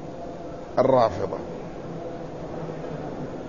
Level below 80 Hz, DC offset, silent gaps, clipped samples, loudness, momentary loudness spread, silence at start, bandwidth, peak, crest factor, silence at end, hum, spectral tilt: -50 dBFS; 0.5%; none; under 0.1%; -28 LUFS; 16 LU; 0 s; 7.4 kHz; -6 dBFS; 20 dB; 0 s; none; -7.5 dB/octave